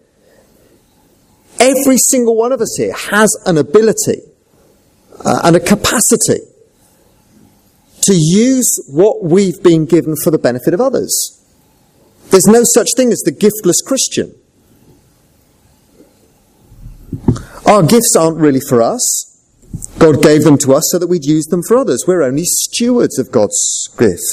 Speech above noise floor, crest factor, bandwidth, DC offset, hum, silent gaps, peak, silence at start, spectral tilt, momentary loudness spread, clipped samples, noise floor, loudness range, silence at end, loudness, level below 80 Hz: 40 dB; 12 dB; 16 kHz; under 0.1%; none; none; 0 dBFS; 1.6 s; -4 dB/octave; 9 LU; 0.2%; -51 dBFS; 4 LU; 0 s; -11 LUFS; -42 dBFS